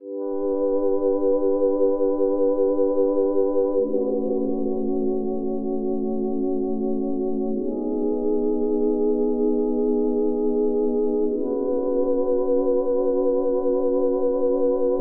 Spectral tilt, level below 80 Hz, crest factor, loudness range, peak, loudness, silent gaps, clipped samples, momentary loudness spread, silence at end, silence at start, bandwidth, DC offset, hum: -7.5 dB/octave; -48 dBFS; 12 dB; 4 LU; -10 dBFS; -23 LUFS; none; under 0.1%; 4 LU; 0 s; 0 s; 1.6 kHz; under 0.1%; none